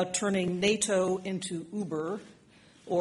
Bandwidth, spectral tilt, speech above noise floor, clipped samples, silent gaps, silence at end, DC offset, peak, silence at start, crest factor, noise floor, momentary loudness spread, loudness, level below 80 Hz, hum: 11.5 kHz; -4 dB/octave; 28 dB; under 0.1%; none; 0 s; under 0.1%; -12 dBFS; 0 s; 18 dB; -58 dBFS; 9 LU; -30 LUFS; -66 dBFS; none